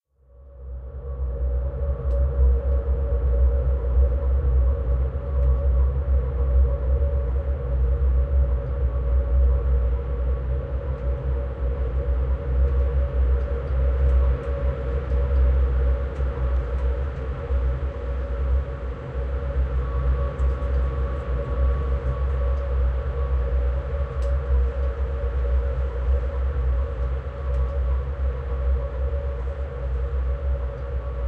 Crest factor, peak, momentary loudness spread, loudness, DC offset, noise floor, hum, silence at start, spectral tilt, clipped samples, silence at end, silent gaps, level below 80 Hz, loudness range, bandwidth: 12 dB; -10 dBFS; 7 LU; -25 LUFS; under 0.1%; -49 dBFS; none; 0.4 s; -10 dB/octave; under 0.1%; 0 s; none; -22 dBFS; 4 LU; 3.4 kHz